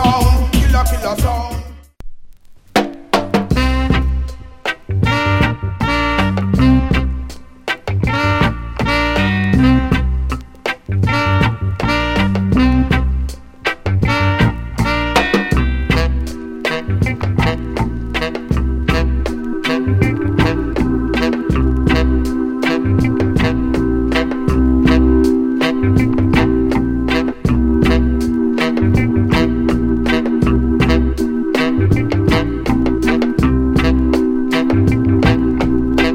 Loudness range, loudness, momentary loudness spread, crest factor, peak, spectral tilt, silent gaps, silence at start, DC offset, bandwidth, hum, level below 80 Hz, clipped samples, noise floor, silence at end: 4 LU; -15 LUFS; 7 LU; 14 dB; 0 dBFS; -7 dB/octave; none; 0 s; under 0.1%; 16 kHz; none; -22 dBFS; under 0.1%; -38 dBFS; 0 s